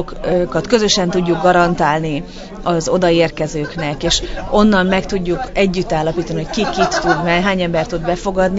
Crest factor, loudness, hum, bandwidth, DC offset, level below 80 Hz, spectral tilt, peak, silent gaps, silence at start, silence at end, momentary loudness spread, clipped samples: 16 dB; -16 LUFS; none; 8 kHz; under 0.1%; -32 dBFS; -5 dB/octave; 0 dBFS; none; 0 s; 0 s; 8 LU; under 0.1%